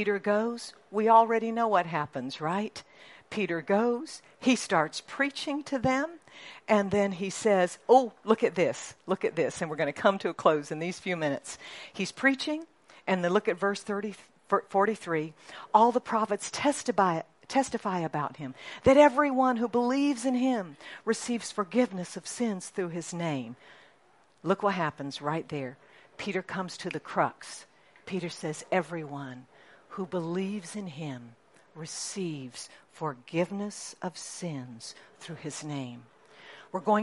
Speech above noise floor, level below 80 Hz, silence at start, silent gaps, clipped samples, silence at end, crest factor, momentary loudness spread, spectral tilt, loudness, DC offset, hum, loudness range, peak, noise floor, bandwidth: 35 dB; -66 dBFS; 0 s; none; under 0.1%; 0 s; 24 dB; 16 LU; -5 dB/octave; -29 LUFS; under 0.1%; none; 10 LU; -6 dBFS; -64 dBFS; 11.5 kHz